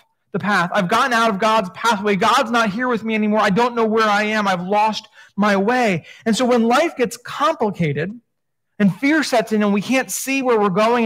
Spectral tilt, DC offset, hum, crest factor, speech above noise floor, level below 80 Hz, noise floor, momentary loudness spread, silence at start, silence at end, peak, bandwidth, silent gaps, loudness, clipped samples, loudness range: -5 dB/octave; under 0.1%; none; 14 dB; 60 dB; -62 dBFS; -77 dBFS; 6 LU; 0.35 s; 0 s; -4 dBFS; 16 kHz; none; -18 LUFS; under 0.1%; 2 LU